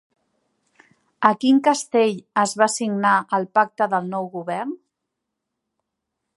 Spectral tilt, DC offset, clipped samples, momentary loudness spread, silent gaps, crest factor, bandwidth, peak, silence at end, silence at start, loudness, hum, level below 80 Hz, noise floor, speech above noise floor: -4 dB/octave; under 0.1%; under 0.1%; 11 LU; none; 22 dB; 11.5 kHz; 0 dBFS; 1.6 s; 1.2 s; -20 LUFS; none; -76 dBFS; -81 dBFS; 61 dB